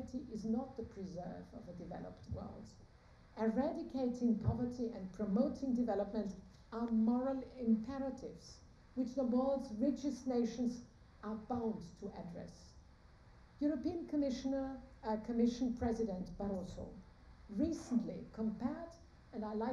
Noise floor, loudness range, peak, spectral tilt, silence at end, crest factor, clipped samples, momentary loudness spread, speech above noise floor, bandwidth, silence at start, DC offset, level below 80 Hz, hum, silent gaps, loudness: -62 dBFS; 6 LU; -22 dBFS; -7.5 dB/octave; 0 s; 18 dB; under 0.1%; 16 LU; 23 dB; 9.4 kHz; 0 s; under 0.1%; -60 dBFS; none; none; -40 LUFS